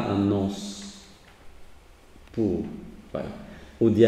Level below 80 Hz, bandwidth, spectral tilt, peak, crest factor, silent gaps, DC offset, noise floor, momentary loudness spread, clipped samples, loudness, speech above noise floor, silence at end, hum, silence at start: -52 dBFS; 12.5 kHz; -7 dB/octave; -6 dBFS; 22 dB; none; under 0.1%; -50 dBFS; 19 LU; under 0.1%; -29 LUFS; 27 dB; 0 s; none; 0 s